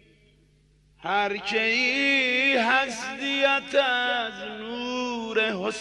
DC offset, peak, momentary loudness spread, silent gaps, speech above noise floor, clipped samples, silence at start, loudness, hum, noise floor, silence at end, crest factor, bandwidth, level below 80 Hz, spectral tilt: under 0.1%; -10 dBFS; 11 LU; none; 36 dB; under 0.1%; 1 s; -24 LUFS; none; -60 dBFS; 0 s; 16 dB; 11.5 kHz; -64 dBFS; -2.5 dB/octave